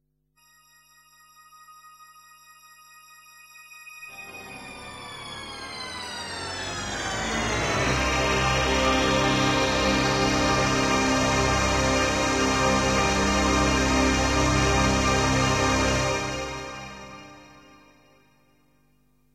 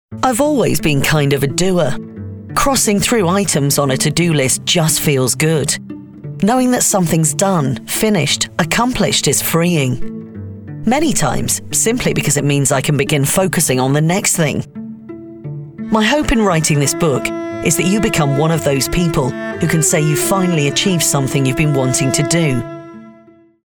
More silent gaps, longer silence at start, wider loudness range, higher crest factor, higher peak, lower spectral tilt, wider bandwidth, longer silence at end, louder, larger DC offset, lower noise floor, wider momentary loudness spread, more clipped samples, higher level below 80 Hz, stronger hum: neither; first, 1.7 s vs 0.1 s; first, 17 LU vs 2 LU; about the same, 18 dB vs 14 dB; second, -8 dBFS vs -2 dBFS; about the same, -4 dB/octave vs -4 dB/octave; second, 15 kHz vs over 20 kHz; first, 1.9 s vs 0.55 s; second, -23 LUFS vs -14 LUFS; neither; first, -65 dBFS vs -46 dBFS; first, 17 LU vs 13 LU; neither; about the same, -36 dBFS vs -36 dBFS; neither